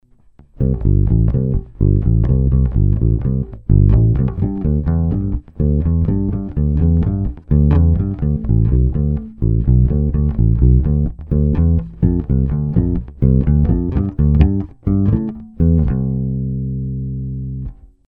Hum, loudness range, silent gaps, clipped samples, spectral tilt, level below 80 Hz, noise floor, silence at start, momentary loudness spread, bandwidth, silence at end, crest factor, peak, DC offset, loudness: none; 2 LU; none; under 0.1%; -13.5 dB/octave; -20 dBFS; -47 dBFS; 0.6 s; 8 LU; 3.1 kHz; 0.35 s; 14 dB; 0 dBFS; under 0.1%; -17 LUFS